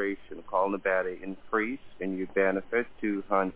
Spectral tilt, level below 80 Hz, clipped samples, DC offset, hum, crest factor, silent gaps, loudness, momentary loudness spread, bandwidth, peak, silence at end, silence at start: -10 dB/octave; -62 dBFS; under 0.1%; under 0.1%; none; 18 dB; none; -30 LUFS; 8 LU; 4 kHz; -12 dBFS; 0 s; 0 s